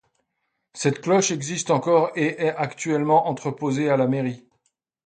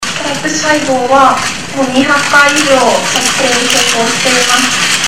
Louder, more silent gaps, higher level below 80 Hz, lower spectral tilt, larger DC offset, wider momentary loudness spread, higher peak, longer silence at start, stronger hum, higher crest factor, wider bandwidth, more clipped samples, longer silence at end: second, -22 LUFS vs -9 LUFS; neither; second, -68 dBFS vs -44 dBFS; first, -5 dB/octave vs -1.5 dB/octave; second, under 0.1% vs 3%; about the same, 8 LU vs 7 LU; second, -6 dBFS vs 0 dBFS; first, 0.75 s vs 0 s; neither; first, 18 dB vs 10 dB; second, 9.4 kHz vs over 20 kHz; second, under 0.1% vs 0.5%; first, 0.7 s vs 0 s